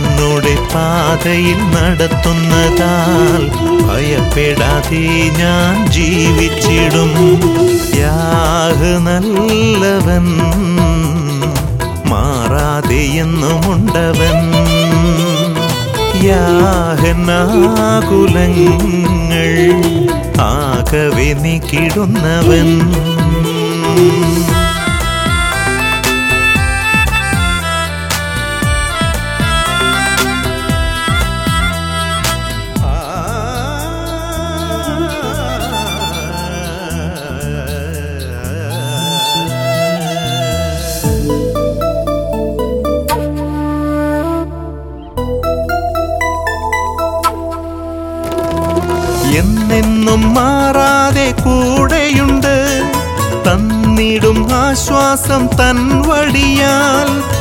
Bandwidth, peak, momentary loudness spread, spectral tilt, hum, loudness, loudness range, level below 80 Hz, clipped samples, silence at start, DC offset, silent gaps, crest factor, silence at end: 17 kHz; 0 dBFS; 8 LU; -5 dB/octave; none; -12 LUFS; 7 LU; -22 dBFS; under 0.1%; 0 s; under 0.1%; none; 12 dB; 0 s